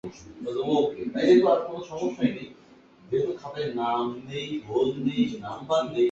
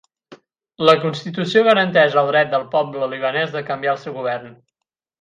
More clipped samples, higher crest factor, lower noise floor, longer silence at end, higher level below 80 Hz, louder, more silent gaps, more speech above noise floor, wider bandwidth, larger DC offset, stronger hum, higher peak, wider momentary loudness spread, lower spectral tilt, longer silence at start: neither; about the same, 18 dB vs 20 dB; second, -53 dBFS vs -82 dBFS; second, 0 s vs 0.7 s; first, -62 dBFS vs -68 dBFS; second, -26 LUFS vs -18 LUFS; neither; second, 28 dB vs 64 dB; second, 7.8 kHz vs 9.6 kHz; neither; neither; second, -8 dBFS vs 0 dBFS; first, 14 LU vs 11 LU; about the same, -6.5 dB/octave vs -5.5 dB/octave; second, 0.05 s vs 0.3 s